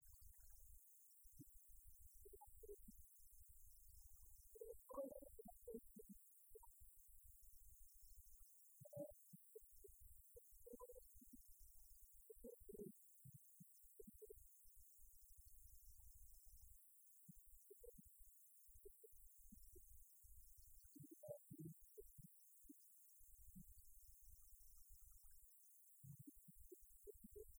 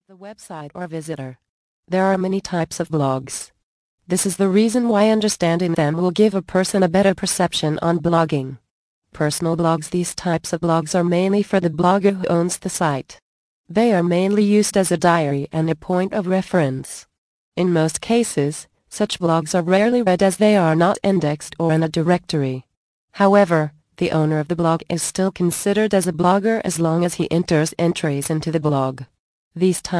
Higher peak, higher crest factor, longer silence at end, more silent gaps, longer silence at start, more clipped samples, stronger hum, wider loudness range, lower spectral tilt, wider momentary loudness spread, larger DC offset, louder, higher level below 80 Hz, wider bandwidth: second, -42 dBFS vs -2 dBFS; first, 22 dB vs 16 dB; about the same, 0 s vs 0 s; second, none vs 1.49-1.83 s, 3.63-3.98 s, 8.71-9.02 s, 13.22-13.64 s, 17.18-17.52 s, 22.77-23.08 s, 29.19-29.51 s; second, 0 s vs 0.2 s; neither; neither; about the same, 6 LU vs 4 LU; about the same, -6 dB/octave vs -5.5 dB/octave; second, 7 LU vs 10 LU; neither; second, -64 LUFS vs -19 LUFS; second, -72 dBFS vs -54 dBFS; first, over 20 kHz vs 11 kHz